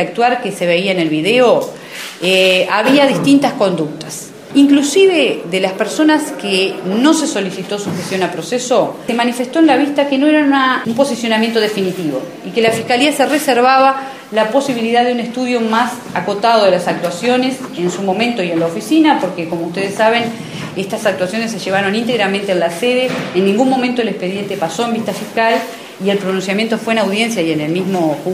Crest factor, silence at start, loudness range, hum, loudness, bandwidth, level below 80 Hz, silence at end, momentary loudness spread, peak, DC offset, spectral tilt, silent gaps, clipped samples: 14 dB; 0 s; 4 LU; none; -14 LUFS; 15.5 kHz; -64 dBFS; 0 s; 9 LU; 0 dBFS; under 0.1%; -4.5 dB/octave; none; under 0.1%